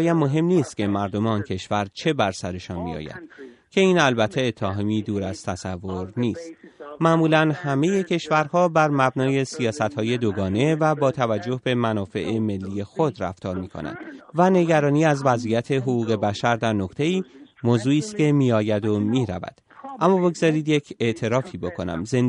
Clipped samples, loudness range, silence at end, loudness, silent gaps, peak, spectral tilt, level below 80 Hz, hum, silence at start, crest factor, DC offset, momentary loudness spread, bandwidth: under 0.1%; 3 LU; 0 s; -22 LUFS; none; -4 dBFS; -6.5 dB/octave; -60 dBFS; none; 0 s; 18 dB; under 0.1%; 12 LU; 11 kHz